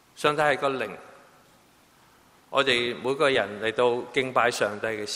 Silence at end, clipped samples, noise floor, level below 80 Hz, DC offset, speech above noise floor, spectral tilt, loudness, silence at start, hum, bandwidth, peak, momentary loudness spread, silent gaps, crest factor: 0 s; under 0.1%; -58 dBFS; -66 dBFS; under 0.1%; 33 dB; -3.5 dB/octave; -25 LUFS; 0.15 s; none; 16 kHz; -6 dBFS; 7 LU; none; 22 dB